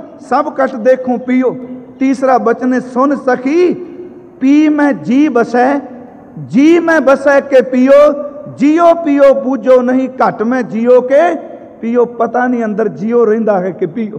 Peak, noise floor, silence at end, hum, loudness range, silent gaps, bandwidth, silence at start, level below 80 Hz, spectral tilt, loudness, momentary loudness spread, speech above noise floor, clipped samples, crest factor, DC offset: 0 dBFS; -30 dBFS; 0 s; none; 4 LU; none; 9.2 kHz; 0 s; -56 dBFS; -6.5 dB/octave; -11 LUFS; 10 LU; 20 dB; under 0.1%; 10 dB; under 0.1%